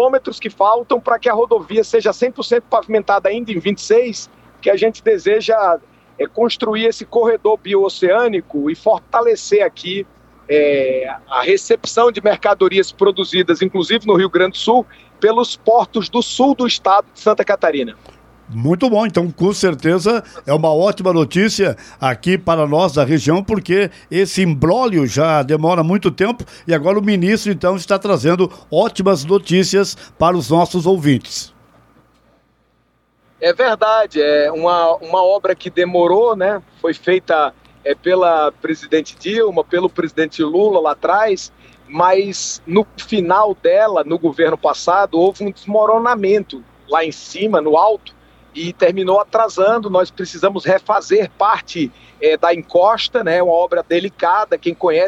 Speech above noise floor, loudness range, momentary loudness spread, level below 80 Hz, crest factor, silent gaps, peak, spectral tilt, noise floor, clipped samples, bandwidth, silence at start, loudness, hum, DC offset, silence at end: 45 dB; 2 LU; 7 LU; -52 dBFS; 14 dB; none; -2 dBFS; -5 dB/octave; -60 dBFS; under 0.1%; 13.5 kHz; 0 s; -15 LUFS; none; under 0.1%; 0 s